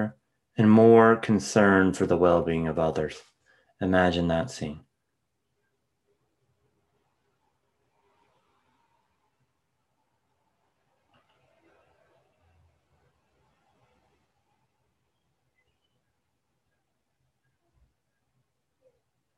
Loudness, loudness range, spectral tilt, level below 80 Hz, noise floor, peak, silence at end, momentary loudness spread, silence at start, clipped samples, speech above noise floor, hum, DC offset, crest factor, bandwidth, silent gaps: -22 LUFS; 14 LU; -6.5 dB/octave; -62 dBFS; -80 dBFS; -4 dBFS; 14.6 s; 18 LU; 0 s; under 0.1%; 59 dB; none; under 0.1%; 24 dB; 11.5 kHz; none